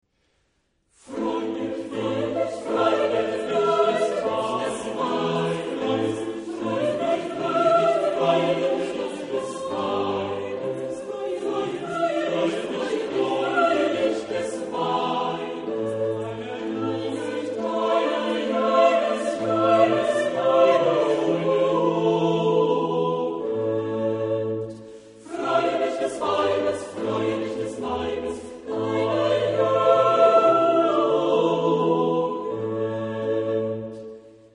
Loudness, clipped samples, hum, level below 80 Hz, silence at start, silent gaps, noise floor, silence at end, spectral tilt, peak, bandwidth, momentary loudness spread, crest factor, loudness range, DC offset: -23 LUFS; under 0.1%; none; -62 dBFS; 1.05 s; none; -69 dBFS; 0.25 s; -6 dB/octave; -6 dBFS; 10.5 kHz; 11 LU; 18 dB; 6 LU; under 0.1%